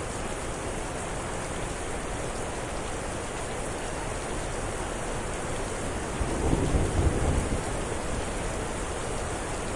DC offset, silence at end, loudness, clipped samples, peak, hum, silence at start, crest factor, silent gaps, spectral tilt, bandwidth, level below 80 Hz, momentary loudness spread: under 0.1%; 0 s; -31 LUFS; under 0.1%; -12 dBFS; none; 0 s; 18 dB; none; -4.5 dB/octave; 11.5 kHz; -36 dBFS; 7 LU